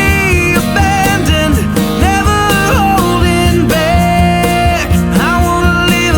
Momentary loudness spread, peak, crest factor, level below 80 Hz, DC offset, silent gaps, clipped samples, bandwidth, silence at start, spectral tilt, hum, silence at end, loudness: 2 LU; 0 dBFS; 10 dB; -20 dBFS; under 0.1%; none; under 0.1%; over 20 kHz; 0 s; -5 dB/octave; none; 0 s; -10 LUFS